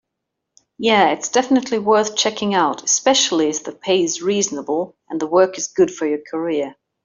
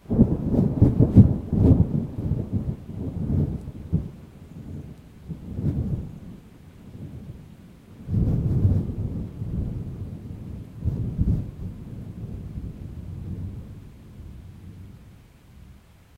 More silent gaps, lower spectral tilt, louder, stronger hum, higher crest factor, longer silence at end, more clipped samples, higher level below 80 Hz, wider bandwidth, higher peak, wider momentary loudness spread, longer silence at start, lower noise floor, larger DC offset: neither; second, -2.5 dB/octave vs -11 dB/octave; first, -18 LUFS vs -24 LUFS; neither; second, 16 dB vs 26 dB; about the same, 0.35 s vs 0.4 s; neither; second, -64 dBFS vs -34 dBFS; first, 7.8 kHz vs 4.5 kHz; about the same, -2 dBFS vs 0 dBFS; second, 9 LU vs 24 LU; first, 0.8 s vs 0.1 s; first, -79 dBFS vs -50 dBFS; neither